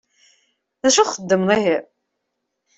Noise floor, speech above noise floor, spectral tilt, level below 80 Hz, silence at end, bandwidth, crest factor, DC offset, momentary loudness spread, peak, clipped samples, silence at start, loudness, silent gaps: -77 dBFS; 59 dB; -3 dB/octave; -62 dBFS; 0.95 s; 8.4 kHz; 18 dB; under 0.1%; 6 LU; -2 dBFS; under 0.1%; 0.85 s; -18 LUFS; none